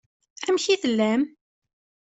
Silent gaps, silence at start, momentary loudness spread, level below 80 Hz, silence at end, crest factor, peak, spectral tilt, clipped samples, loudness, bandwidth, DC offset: none; 0.4 s; 9 LU; -70 dBFS; 0.85 s; 16 dB; -10 dBFS; -4 dB/octave; under 0.1%; -24 LUFS; 8.2 kHz; under 0.1%